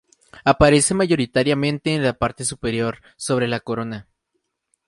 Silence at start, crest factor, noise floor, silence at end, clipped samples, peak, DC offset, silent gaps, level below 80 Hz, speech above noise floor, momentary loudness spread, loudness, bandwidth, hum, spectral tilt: 0.35 s; 20 dB; -75 dBFS; 0.85 s; under 0.1%; 0 dBFS; under 0.1%; none; -40 dBFS; 55 dB; 13 LU; -20 LUFS; 11.5 kHz; none; -4.5 dB/octave